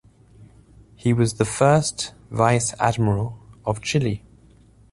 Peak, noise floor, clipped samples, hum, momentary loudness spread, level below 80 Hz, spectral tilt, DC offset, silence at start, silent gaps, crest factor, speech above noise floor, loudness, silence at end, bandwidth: -2 dBFS; -52 dBFS; under 0.1%; none; 12 LU; -48 dBFS; -5.5 dB/octave; under 0.1%; 0.4 s; none; 20 dB; 31 dB; -22 LUFS; 0.75 s; 11.5 kHz